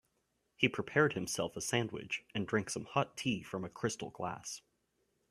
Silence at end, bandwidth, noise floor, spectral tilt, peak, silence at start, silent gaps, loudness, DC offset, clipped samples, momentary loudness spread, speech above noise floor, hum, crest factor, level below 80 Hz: 0.7 s; 15 kHz; -80 dBFS; -4 dB/octave; -12 dBFS; 0.6 s; none; -36 LUFS; under 0.1%; under 0.1%; 10 LU; 44 dB; none; 26 dB; -70 dBFS